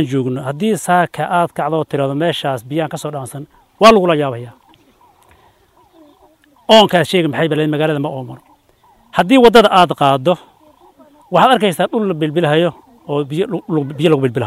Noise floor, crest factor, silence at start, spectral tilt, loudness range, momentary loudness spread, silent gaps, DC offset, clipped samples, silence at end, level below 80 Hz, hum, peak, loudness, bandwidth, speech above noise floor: -52 dBFS; 16 dB; 0 s; -5.5 dB/octave; 4 LU; 13 LU; none; under 0.1%; 0.1%; 0 s; -50 dBFS; none; 0 dBFS; -14 LUFS; 16 kHz; 38 dB